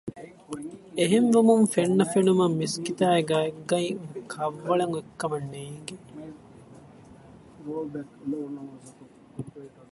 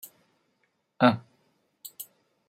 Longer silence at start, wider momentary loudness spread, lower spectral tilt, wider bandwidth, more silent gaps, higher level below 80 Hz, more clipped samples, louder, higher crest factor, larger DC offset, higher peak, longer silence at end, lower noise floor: second, 0.05 s vs 1 s; about the same, 22 LU vs 23 LU; about the same, -5.5 dB/octave vs -5.5 dB/octave; second, 11.5 kHz vs 16 kHz; neither; first, -66 dBFS vs -76 dBFS; neither; about the same, -25 LUFS vs -25 LUFS; second, 20 dB vs 28 dB; neither; about the same, -6 dBFS vs -4 dBFS; second, 0.25 s vs 0.45 s; second, -50 dBFS vs -74 dBFS